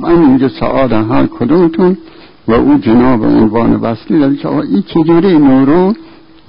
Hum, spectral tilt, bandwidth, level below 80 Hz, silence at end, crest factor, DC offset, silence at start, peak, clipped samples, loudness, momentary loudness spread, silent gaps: none; -13.5 dB/octave; 5.4 kHz; -34 dBFS; 0 s; 8 dB; under 0.1%; 0 s; 0 dBFS; under 0.1%; -10 LUFS; 6 LU; none